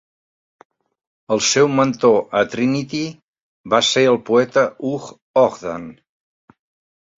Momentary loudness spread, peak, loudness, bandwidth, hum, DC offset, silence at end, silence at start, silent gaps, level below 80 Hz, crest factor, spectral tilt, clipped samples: 14 LU; -2 dBFS; -17 LUFS; 7.8 kHz; none; under 0.1%; 1.25 s; 1.3 s; 3.24-3.33 s, 3.42-3.64 s, 5.22-5.34 s; -60 dBFS; 18 dB; -4 dB/octave; under 0.1%